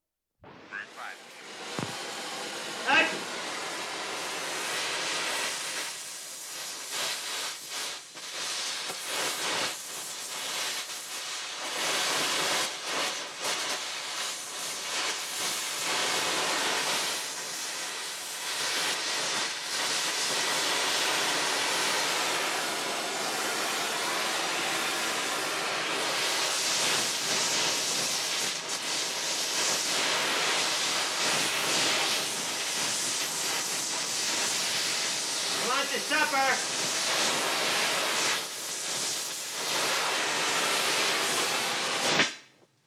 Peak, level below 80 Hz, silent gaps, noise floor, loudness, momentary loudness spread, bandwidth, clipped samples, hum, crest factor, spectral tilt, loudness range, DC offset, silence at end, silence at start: -12 dBFS; -86 dBFS; none; -57 dBFS; -28 LUFS; 9 LU; over 20 kHz; under 0.1%; none; 18 dB; 0 dB/octave; 5 LU; under 0.1%; 0.4 s; 0.45 s